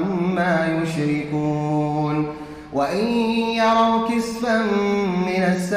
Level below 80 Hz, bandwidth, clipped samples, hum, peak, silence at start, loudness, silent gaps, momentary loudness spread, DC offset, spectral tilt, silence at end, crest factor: -50 dBFS; 15 kHz; under 0.1%; none; -8 dBFS; 0 s; -21 LUFS; none; 5 LU; under 0.1%; -6.5 dB/octave; 0 s; 12 dB